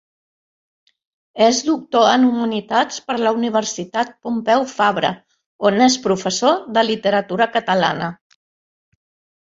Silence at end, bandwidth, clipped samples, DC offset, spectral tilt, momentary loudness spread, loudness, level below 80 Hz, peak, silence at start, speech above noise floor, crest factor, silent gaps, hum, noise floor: 1.4 s; 7.8 kHz; under 0.1%; under 0.1%; -3.5 dB/octave; 8 LU; -18 LUFS; -62 dBFS; -2 dBFS; 1.35 s; over 73 dB; 18 dB; 5.46-5.59 s; none; under -90 dBFS